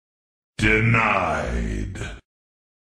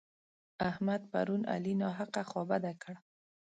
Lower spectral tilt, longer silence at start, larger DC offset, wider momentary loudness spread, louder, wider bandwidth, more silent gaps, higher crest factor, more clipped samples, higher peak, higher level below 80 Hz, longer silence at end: about the same, -6 dB/octave vs -7 dB/octave; about the same, 0.6 s vs 0.6 s; neither; first, 18 LU vs 10 LU; first, -21 LUFS vs -36 LUFS; first, 10.5 kHz vs 9 kHz; neither; about the same, 18 dB vs 18 dB; neither; first, -6 dBFS vs -20 dBFS; first, -34 dBFS vs -70 dBFS; first, 0.65 s vs 0.45 s